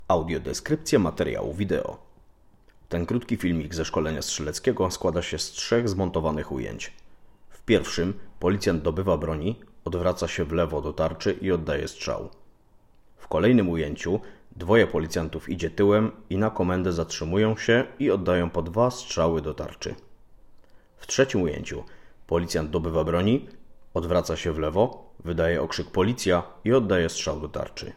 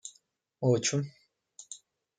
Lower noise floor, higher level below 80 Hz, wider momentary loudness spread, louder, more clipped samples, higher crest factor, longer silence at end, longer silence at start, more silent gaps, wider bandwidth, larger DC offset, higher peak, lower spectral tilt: second, -56 dBFS vs -67 dBFS; first, -46 dBFS vs -76 dBFS; second, 10 LU vs 21 LU; first, -26 LUFS vs -30 LUFS; neither; about the same, 20 dB vs 20 dB; second, 0 s vs 0.45 s; about the same, 0 s vs 0.05 s; neither; first, 16 kHz vs 9.6 kHz; neither; first, -6 dBFS vs -14 dBFS; about the same, -5.5 dB/octave vs -4.5 dB/octave